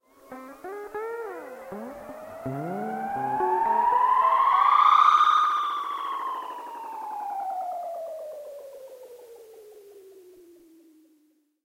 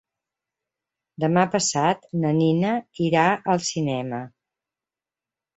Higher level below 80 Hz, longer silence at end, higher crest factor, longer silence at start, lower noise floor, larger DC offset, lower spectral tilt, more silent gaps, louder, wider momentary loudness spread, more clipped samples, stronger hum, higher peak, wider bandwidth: about the same, -68 dBFS vs -64 dBFS; about the same, 1.35 s vs 1.3 s; about the same, 18 dB vs 20 dB; second, 0.3 s vs 1.2 s; second, -66 dBFS vs under -90 dBFS; neither; about the same, -4.5 dB/octave vs -5 dB/octave; neither; about the same, -24 LUFS vs -22 LUFS; first, 23 LU vs 8 LU; neither; neither; second, -8 dBFS vs -4 dBFS; first, 16 kHz vs 8.2 kHz